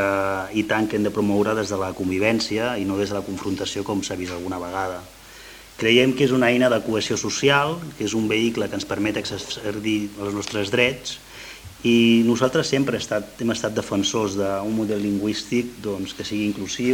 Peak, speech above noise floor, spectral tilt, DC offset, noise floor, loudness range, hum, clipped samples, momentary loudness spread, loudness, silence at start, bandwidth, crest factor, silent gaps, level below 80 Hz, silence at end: -2 dBFS; 21 dB; -4.5 dB/octave; under 0.1%; -43 dBFS; 5 LU; none; under 0.1%; 11 LU; -22 LUFS; 0 s; 17 kHz; 20 dB; none; -54 dBFS; 0 s